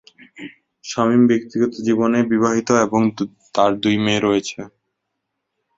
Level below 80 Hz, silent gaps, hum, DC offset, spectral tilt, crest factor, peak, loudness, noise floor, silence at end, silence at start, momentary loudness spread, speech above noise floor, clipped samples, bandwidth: -56 dBFS; none; none; under 0.1%; -5.5 dB/octave; 18 dB; -2 dBFS; -18 LUFS; -77 dBFS; 1.1 s; 0.4 s; 22 LU; 60 dB; under 0.1%; 7.8 kHz